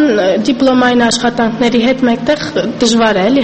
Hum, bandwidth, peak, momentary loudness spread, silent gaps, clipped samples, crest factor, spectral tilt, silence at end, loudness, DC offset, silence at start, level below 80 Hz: none; 8.8 kHz; 0 dBFS; 4 LU; none; under 0.1%; 10 dB; -4 dB/octave; 0 s; -11 LUFS; under 0.1%; 0 s; -42 dBFS